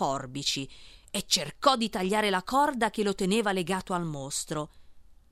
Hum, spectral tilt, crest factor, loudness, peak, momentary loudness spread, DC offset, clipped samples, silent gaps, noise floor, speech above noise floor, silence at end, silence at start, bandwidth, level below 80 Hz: none; -3.5 dB/octave; 22 dB; -28 LUFS; -6 dBFS; 10 LU; under 0.1%; under 0.1%; none; -51 dBFS; 23 dB; 0.2 s; 0 s; 16 kHz; -56 dBFS